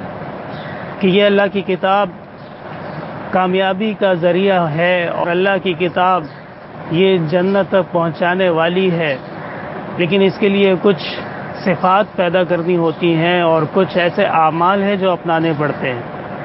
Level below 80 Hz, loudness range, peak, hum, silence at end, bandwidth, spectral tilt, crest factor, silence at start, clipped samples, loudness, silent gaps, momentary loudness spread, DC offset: -54 dBFS; 2 LU; 0 dBFS; none; 0 s; 5.8 kHz; -11 dB/octave; 16 dB; 0 s; under 0.1%; -15 LUFS; none; 14 LU; under 0.1%